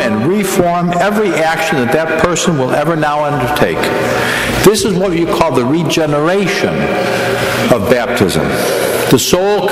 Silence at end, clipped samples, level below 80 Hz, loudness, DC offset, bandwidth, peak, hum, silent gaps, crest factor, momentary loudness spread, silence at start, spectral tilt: 0 s; 0.2%; -36 dBFS; -12 LUFS; under 0.1%; 16 kHz; 0 dBFS; none; none; 12 dB; 4 LU; 0 s; -4.5 dB/octave